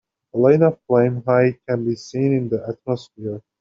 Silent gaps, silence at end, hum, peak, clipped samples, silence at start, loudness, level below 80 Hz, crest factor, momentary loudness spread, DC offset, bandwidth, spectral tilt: none; 0.2 s; none; -2 dBFS; under 0.1%; 0.35 s; -19 LUFS; -60 dBFS; 16 dB; 13 LU; under 0.1%; 7.6 kHz; -8 dB/octave